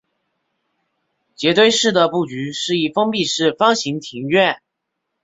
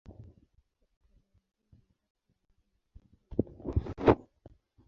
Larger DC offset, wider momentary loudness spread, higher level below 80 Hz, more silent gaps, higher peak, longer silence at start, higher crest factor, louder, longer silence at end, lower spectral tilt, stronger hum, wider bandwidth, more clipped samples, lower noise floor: neither; about the same, 11 LU vs 10 LU; second, -62 dBFS vs -46 dBFS; second, none vs 0.97-1.01 s, 2.10-2.15 s; first, -2 dBFS vs -6 dBFS; first, 1.4 s vs 0.2 s; second, 18 dB vs 30 dB; first, -17 LUFS vs -31 LUFS; about the same, 0.65 s vs 0.7 s; second, -3.5 dB/octave vs -7.5 dB/octave; neither; first, 8 kHz vs 7 kHz; neither; about the same, -77 dBFS vs -74 dBFS